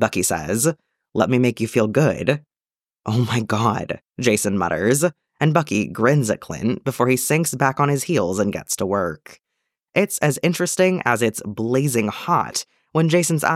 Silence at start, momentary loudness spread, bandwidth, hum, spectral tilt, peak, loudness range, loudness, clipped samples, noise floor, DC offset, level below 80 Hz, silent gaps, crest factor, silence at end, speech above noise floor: 0 s; 7 LU; 16.5 kHz; none; -5 dB/octave; -2 dBFS; 2 LU; -20 LUFS; under 0.1%; under -90 dBFS; under 0.1%; -56 dBFS; none; 18 dB; 0 s; over 70 dB